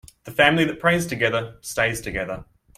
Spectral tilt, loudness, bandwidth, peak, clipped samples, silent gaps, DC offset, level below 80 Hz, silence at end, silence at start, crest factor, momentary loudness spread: -4.5 dB/octave; -22 LUFS; 16 kHz; -2 dBFS; under 0.1%; none; under 0.1%; -48 dBFS; 0.35 s; 0.25 s; 22 dB; 12 LU